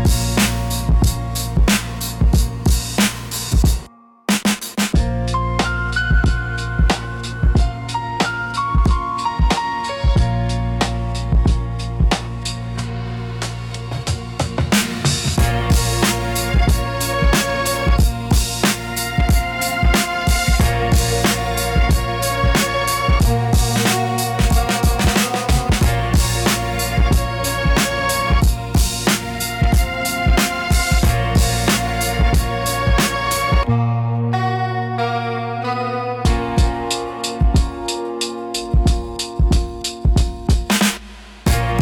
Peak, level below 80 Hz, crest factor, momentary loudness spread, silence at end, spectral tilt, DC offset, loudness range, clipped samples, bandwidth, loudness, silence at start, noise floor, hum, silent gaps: -4 dBFS; -20 dBFS; 14 dB; 7 LU; 0 s; -4.5 dB/octave; under 0.1%; 3 LU; under 0.1%; 18 kHz; -18 LUFS; 0 s; -38 dBFS; none; none